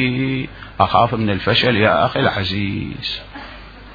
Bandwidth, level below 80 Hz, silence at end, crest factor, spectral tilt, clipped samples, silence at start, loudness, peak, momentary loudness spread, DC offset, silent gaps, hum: 5 kHz; -42 dBFS; 0 s; 18 dB; -7.5 dB/octave; under 0.1%; 0 s; -17 LUFS; 0 dBFS; 18 LU; under 0.1%; none; none